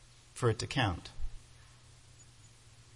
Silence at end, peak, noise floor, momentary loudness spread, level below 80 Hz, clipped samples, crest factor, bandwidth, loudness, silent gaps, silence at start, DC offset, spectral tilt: 0.15 s; -16 dBFS; -58 dBFS; 26 LU; -48 dBFS; under 0.1%; 22 dB; 11.5 kHz; -34 LUFS; none; 0.35 s; under 0.1%; -5 dB/octave